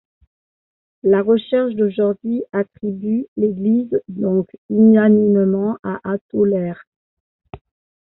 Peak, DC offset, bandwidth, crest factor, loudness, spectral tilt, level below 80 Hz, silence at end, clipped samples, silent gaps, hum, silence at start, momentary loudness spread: -4 dBFS; under 0.1%; 4.1 kHz; 14 dB; -18 LUFS; -8 dB/octave; -58 dBFS; 0.5 s; under 0.1%; 3.28-3.36 s, 4.58-4.69 s, 5.79-5.83 s, 6.21-6.29 s, 6.87-7.39 s; none; 1.05 s; 11 LU